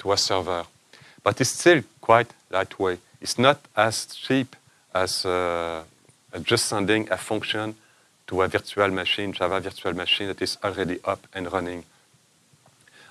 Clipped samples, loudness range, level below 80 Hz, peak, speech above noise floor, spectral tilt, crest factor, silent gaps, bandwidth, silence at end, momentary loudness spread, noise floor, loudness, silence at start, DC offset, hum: under 0.1%; 4 LU; -60 dBFS; -2 dBFS; 37 dB; -3.5 dB/octave; 24 dB; none; 14 kHz; 1.3 s; 11 LU; -61 dBFS; -24 LUFS; 0 s; under 0.1%; none